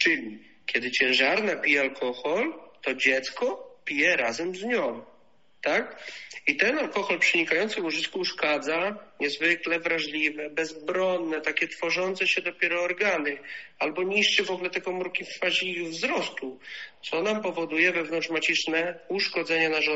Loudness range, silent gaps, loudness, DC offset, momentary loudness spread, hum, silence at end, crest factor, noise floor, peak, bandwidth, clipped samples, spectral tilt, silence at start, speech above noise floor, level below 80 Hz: 2 LU; none; -26 LUFS; 0.1%; 10 LU; none; 0 s; 22 dB; -63 dBFS; -6 dBFS; 8 kHz; under 0.1%; -0.5 dB/octave; 0 s; 36 dB; -72 dBFS